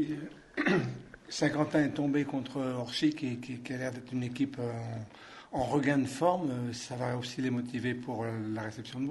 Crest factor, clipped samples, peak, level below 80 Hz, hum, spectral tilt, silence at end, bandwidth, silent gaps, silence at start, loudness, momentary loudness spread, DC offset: 20 dB; under 0.1%; -14 dBFS; -64 dBFS; none; -6 dB/octave; 0 s; 11.5 kHz; none; 0 s; -33 LUFS; 11 LU; under 0.1%